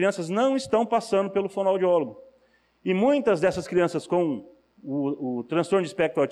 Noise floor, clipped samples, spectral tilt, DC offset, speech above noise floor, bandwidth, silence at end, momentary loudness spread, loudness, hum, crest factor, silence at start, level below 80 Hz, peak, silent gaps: -63 dBFS; under 0.1%; -6 dB/octave; under 0.1%; 39 dB; 12 kHz; 0 s; 8 LU; -25 LUFS; none; 12 dB; 0 s; -64 dBFS; -12 dBFS; none